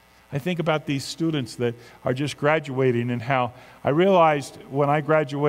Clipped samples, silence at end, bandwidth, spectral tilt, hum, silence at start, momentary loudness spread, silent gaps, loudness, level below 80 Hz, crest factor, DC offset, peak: under 0.1%; 0 s; 16 kHz; -6.5 dB/octave; none; 0.3 s; 11 LU; none; -23 LUFS; -62 dBFS; 18 dB; under 0.1%; -4 dBFS